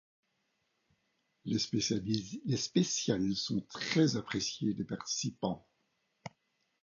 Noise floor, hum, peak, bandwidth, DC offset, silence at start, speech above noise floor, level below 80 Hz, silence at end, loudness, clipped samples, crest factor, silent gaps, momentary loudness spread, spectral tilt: -80 dBFS; none; -14 dBFS; 7.4 kHz; under 0.1%; 1.45 s; 46 dB; -66 dBFS; 0.55 s; -34 LUFS; under 0.1%; 22 dB; none; 16 LU; -4.5 dB/octave